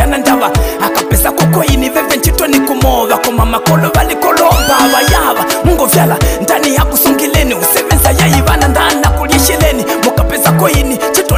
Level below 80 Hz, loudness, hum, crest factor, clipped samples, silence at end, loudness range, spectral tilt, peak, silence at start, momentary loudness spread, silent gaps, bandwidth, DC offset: -18 dBFS; -9 LUFS; none; 10 dB; under 0.1%; 0 s; 1 LU; -4.5 dB/octave; 0 dBFS; 0 s; 3 LU; none; 16.5 kHz; under 0.1%